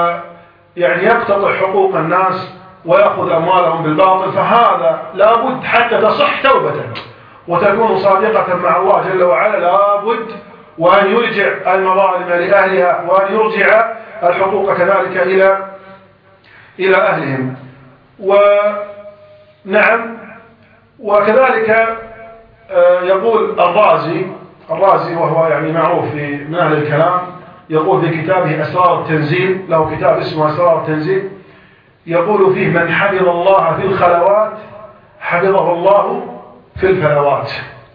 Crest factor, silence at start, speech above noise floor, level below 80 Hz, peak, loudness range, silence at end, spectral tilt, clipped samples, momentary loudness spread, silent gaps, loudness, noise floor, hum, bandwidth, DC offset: 14 dB; 0 s; 34 dB; -52 dBFS; 0 dBFS; 3 LU; 0.15 s; -9 dB/octave; under 0.1%; 10 LU; none; -12 LUFS; -46 dBFS; none; 5.2 kHz; under 0.1%